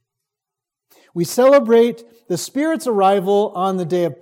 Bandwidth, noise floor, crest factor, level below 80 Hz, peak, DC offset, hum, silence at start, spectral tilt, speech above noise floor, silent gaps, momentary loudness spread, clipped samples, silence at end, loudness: 17 kHz; -85 dBFS; 16 dB; -74 dBFS; -2 dBFS; under 0.1%; none; 1.15 s; -5.5 dB/octave; 69 dB; none; 13 LU; under 0.1%; 0.1 s; -17 LUFS